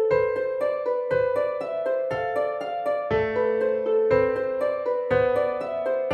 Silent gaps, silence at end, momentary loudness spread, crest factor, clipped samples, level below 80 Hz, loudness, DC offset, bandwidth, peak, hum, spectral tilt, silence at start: none; 0 s; 5 LU; 16 dB; under 0.1%; -54 dBFS; -25 LUFS; under 0.1%; 5.8 kHz; -8 dBFS; none; -7 dB/octave; 0 s